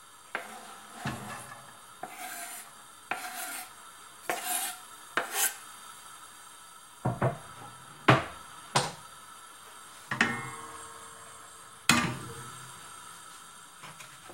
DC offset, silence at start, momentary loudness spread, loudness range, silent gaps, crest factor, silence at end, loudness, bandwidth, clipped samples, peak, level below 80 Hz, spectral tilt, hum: under 0.1%; 0 s; 20 LU; 9 LU; none; 32 dB; 0 s; -32 LUFS; 16 kHz; under 0.1%; -4 dBFS; -64 dBFS; -3 dB/octave; none